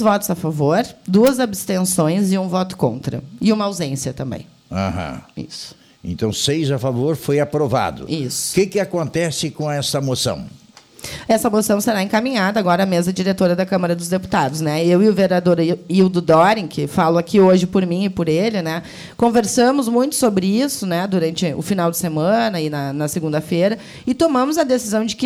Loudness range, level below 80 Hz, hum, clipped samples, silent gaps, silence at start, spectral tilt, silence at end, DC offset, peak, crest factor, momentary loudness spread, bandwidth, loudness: 6 LU; -50 dBFS; none; under 0.1%; none; 0 s; -5.5 dB/octave; 0 s; under 0.1%; -2 dBFS; 14 dB; 11 LU; 19 kHz; -18 LUFS